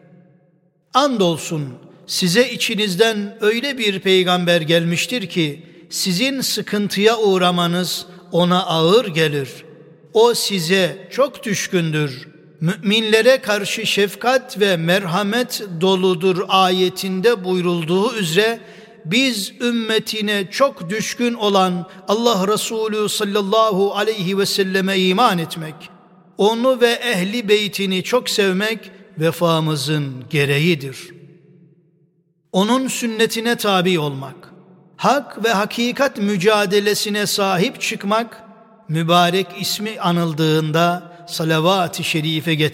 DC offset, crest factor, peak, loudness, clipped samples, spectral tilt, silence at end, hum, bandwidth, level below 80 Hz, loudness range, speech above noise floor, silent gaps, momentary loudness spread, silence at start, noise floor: under 0.1%; 18 dB; 0 dBFS; -18 LUFS; under 0.1%; -4.5 dB/octave; 0 s; none; 16.5 kHz; -66 dBFS; 2 LU; 44 dB; none; 8 LU; 0.95 s; -61 dBFS